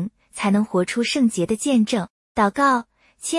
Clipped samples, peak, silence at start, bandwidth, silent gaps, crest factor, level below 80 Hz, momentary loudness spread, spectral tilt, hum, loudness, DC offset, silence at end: under 0.1%; -6 dBFS; 0 s; 12 kHz; 2.10-2.35 s; 16 dB; -56 dBFS; 8 LU; -4.5 dB/octave; none; -21 LUFS; under 0.1%; 0 s